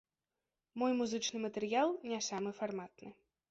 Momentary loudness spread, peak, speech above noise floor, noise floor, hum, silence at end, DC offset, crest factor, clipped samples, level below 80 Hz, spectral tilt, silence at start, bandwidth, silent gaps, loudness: 18 LU; -20 dBFS; over 53 dB; under -90 dBFS; none; 0.4 s; under 0.1%; 18 dB; under 0.1%; -80 dBFS; -3 dB/octave; 0.75 s; 8 kHz; none; -37 LUFS